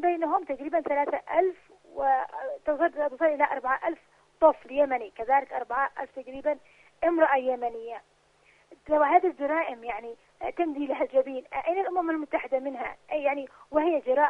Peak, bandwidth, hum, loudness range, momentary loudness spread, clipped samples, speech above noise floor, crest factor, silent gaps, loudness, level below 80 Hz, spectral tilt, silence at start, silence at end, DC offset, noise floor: -8 dBFS; 5.8 kHz; none; 3 LU; 13 LU; under 0.1%; 36 dB; 20 dB; none; -28 LUFS; -64 dBFS; -6 dB/octave; 0 s; 0 s; under 0.1%; -62 dBFS